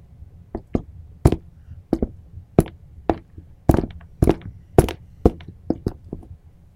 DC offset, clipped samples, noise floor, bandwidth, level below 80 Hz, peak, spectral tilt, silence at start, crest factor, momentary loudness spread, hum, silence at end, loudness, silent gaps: under 0.1%; under 0.1%; -44 dBFS; 16.5 kHz; -30 dBFS; 0 dBFS; -8 dB/octave; 0.55 s; 24 dB; 18 LU; none; 0.4 s; -23 LUFS; none